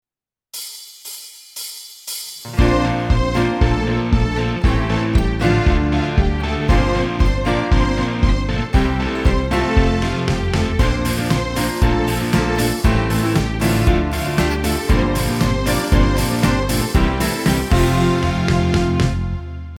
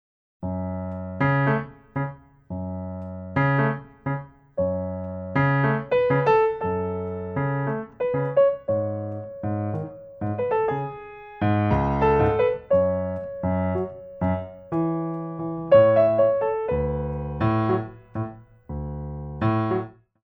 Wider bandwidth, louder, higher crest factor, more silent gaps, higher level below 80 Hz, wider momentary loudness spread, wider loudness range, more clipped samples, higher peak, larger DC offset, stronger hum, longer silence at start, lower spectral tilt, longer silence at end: first, 18 kHz vs 5 kHz; first, -18 LUFS vs -24 LUFS; about the same, 16 dB vs 18 dB; neither; first, -22 dBFS vs -44 dBFS; second, 11 LU vs 14 LU; second, 2 LU vs 6 LU; neither; first, -2 dBFS vs -6 dBFS; neither; neither; first, 0.55 s vs 0.4 s; second, -6 dB/octave vs -10 dB/octave; second, 0 s vs 0.35 s